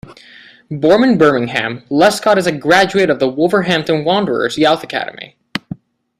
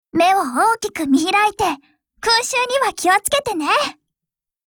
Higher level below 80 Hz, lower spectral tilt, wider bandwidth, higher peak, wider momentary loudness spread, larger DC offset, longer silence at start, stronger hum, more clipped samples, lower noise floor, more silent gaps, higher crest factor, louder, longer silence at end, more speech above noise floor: about the same, -52 dBFS vs -54 dBFS; first, -5 dB/octave vs -2 dB/octave; second, 15.5 kHz vs over 20 kHz; first, 0 dBFS vs -4 dBFS; first, 15 LU vs 6 LU; neither; about the same, 0.1 s vs 0.15 s; neither; neither; second, -42 dBFS vs -85 dBFS; neither; about the same, 14 dB vs 16 dB; first, -13 LUFS vs -17 LUFS; second, 0.45 s vs 0.75 s; second, 29 dB vs 68 dB